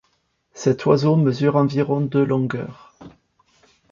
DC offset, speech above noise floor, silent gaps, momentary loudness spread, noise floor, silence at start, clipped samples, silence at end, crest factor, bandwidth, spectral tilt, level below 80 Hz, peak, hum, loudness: under 0.1%; 49 dB; none; 9 LU; -67 dBFS; 0.55 s; under 0.1%; 0.85 s; 18 dB; 7.4 kHz; -8 dB/octave; -58 dBFS; -4 dBFS; none; -19 LUFS